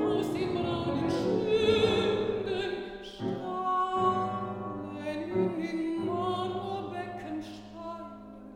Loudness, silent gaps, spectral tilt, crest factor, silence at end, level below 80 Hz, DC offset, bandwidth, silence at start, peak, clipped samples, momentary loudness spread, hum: -31 LUFS; none; -6.5 dB/octave; 18 dB; 0 s; -58 dBFS; under 0.1%; 15.5 kHz; 0 s; -14 dBFS; under 0.1%; 15 LU; none